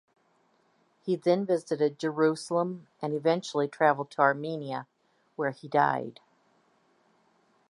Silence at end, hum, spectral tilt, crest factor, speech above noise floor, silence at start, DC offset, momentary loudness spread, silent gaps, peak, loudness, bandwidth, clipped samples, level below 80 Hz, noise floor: 1.6 s; none; -6 dB/octave; 22 dB; 41 dB; 1.05 s; under 0.1%; 11 LU; none; -8 dBFS; -28 LUFS; 11.5 kHz; under 0.1%; -84 dBFS; -69 dBFS